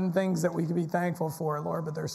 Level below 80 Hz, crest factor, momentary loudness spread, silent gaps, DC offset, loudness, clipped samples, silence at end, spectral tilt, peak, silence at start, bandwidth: -70 dBFS; 14 dB; 5 LU; none; under 0.1%; -30 LUFS; under 0.1%; 0 s; -6.5 dB/octave; -14 dBFS; 0 s; 14.5 kHz